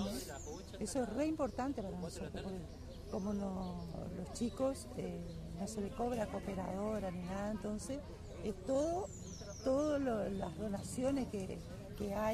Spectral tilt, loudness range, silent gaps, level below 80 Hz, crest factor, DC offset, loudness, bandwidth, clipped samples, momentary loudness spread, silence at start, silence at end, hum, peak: -6 dB/octave; 4 LU; none; -54 dBFS; 16 dB; under 0.1%; -41 LUFS; 14.5 kHz; under 0.1%; 10 LU; 0 s; 0 s; none; -24 dBFS